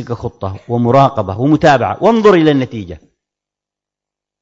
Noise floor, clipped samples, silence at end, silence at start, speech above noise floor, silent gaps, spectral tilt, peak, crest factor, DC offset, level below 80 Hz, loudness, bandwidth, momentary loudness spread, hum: -85 dBFS; under 0.1%; 1.45 s; 0 s; 73 dB; none; -7.5 dB/octave; 0 dBFS; 14 dB; under 0.1%; -44 dBFS; -12 LUFS; 7.8 kHz; 15 LU; 50 Hz at -40 dBFS